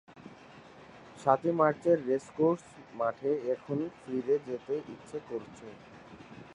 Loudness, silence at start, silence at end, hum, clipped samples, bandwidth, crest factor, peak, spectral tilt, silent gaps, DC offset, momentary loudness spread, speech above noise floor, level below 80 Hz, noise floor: -31 LUFS; 0.1 s; 0 s; none; under 0.1%; 10.5 kHz; 22 dB; -10 dBFS; -7.5 dB/octave; none; under 0.1%; 24 LU; 22 dB; -72 dBFS; -53 dBFS